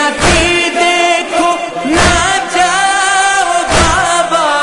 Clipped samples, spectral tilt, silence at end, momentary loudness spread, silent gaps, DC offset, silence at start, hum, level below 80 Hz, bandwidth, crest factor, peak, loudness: under 0.1%; -2.5 dB/octave; 0 s; 3 LU; none; under 0.1%; 0 s; none; -28 dBFS; 11 kHz; 10 dB; 0 dBFS; -10 LUFS